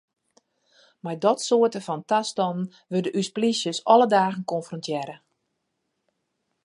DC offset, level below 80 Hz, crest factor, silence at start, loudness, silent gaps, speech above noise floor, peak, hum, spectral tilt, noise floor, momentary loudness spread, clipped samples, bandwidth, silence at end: under 0.1%; -78 dBFS; 22 dB; 1.05 s; -24 LUFS; none; 54 dB; -4 dBFS; none; -4.5 dB/octave; -78 dBFS; 13 LU; under 0.1%; 11.5 kHz; 1.5 s